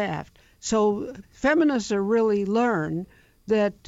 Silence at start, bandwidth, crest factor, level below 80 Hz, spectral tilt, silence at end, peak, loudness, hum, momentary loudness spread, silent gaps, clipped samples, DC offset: 0 s; 8 kHz; 14 dB; -54 dBFS; -5.5 dB/octave; 0.15 s; -10 dBFS; -24 LUFS; none; 13 LU; none; under 0.1%; under 0.1%